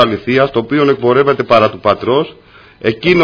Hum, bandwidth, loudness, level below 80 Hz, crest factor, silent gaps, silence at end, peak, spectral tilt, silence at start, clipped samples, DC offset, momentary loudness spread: none; 5.4 kHz; -12 LUFS; -46 dBFS; 12 dB; none; 0 s; 0 dBFS; -7.5 dB/octave; 0 s; 0.2%; under 0.1%; 7 LU